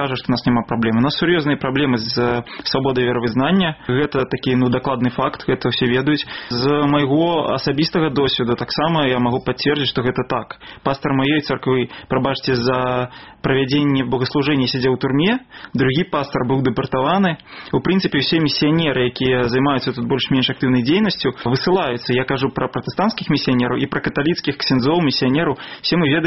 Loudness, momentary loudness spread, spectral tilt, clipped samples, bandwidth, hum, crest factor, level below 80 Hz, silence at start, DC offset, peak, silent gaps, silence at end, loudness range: -18 LUFS; 5 LU; -4.5 dB/octave; under 0.1%; 6 kHz; none; 16 dB; -46 dBFS; 0 s; 0.2%; -2 dBFS; none; 0 s; 2 LU